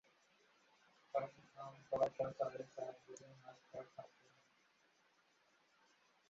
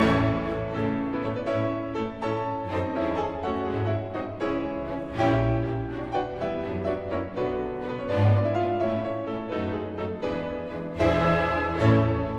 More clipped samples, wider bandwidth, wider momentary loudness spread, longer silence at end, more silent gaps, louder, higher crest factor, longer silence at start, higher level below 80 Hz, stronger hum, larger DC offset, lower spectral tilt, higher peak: neither; about the same, 7.6 kHz vs 7.8 kHz; first, 19 LU vs 9 LU; first, 2.2 s vs 0 s; neither; second, -45 LUFS vs -27 LUFS; first, 26 dB vs 16 dB; first, 1.15 s vs 0 s; second, -82 dBFS vs -44 dBFS; neither; neither; second, -5 dB/octave vs -8 dB/octave; second, -24 dBFS vs -10 dBFS